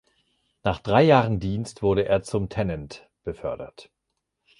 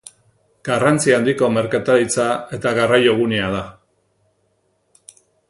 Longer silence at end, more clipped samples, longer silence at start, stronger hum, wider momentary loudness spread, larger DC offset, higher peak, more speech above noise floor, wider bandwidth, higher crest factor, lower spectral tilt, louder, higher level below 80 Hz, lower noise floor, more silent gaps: second, 0.8 s vs 1.8 s; neither; about the same, 0.65 s vs 0.65 s; neither; first, 19 LU vs 9 LU; neither; second, -4 dBFS vs 0 dBFS; first, 56 dB vs 48 dB; about the same, 11.5 kHz vs 11.5 kHz; about the same, 22 dB vs 18 dB; first, -7 dB/octave vs -4.5 dB/octave; second, -23 LUFS vs -17 LUFS; first, -46 dBFS vs -52 dBFS; first, -80 dBFS vs -65 dBFS; neither